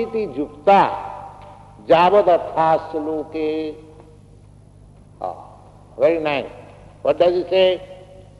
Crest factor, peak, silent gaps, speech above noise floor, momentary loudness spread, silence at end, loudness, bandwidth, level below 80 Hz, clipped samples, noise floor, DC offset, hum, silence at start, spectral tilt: 18 dB; -2 dBFS; none; 28 dB; 21 LU; 0.2 s; -18 LUFS; 11 kHz; -52 dBFS; under 0.1%; -46 dBFS; under 0.1%; 50 Hz at -45 dBFS; 0 s; -6.5 dB/octave